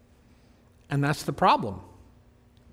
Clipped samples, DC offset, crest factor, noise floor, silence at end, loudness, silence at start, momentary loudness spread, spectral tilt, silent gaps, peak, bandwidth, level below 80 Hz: under 0.1%; under 0.1%; 20 dB; -58 dBFS; 0.85 s; -26 LUFS; 0.9 s; 13 LU; -6 dB/octave; none; -8 dBFS; 16 kHz; -56 dBFS